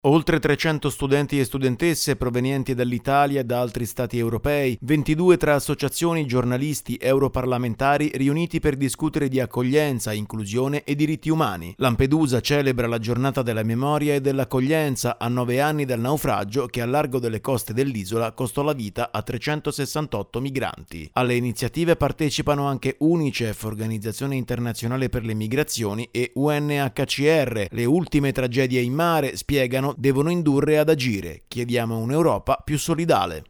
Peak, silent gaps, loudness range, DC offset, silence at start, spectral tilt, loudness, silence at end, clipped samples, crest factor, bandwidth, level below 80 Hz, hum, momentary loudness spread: -2 dBFS; none; 4 LU; under 0.1%; 0.05 s; -6 dB/octave; -23 LUFS; 0.05 s; under 0.1%; 20 dB; over 20 kHz; -44 dBFS; none; 7 LU